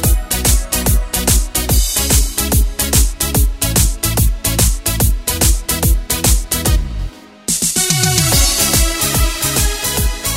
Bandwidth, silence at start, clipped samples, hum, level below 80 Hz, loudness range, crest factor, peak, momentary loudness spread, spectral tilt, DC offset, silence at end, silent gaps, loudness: 16.5 kHz; 0 s; under 0.1%; none; -18 dBFS; 2 LU; 14 dB; 0 dBFS; 4 LU; -3 dB/octave; under 0.1%; 0 s; none; -14 LUFS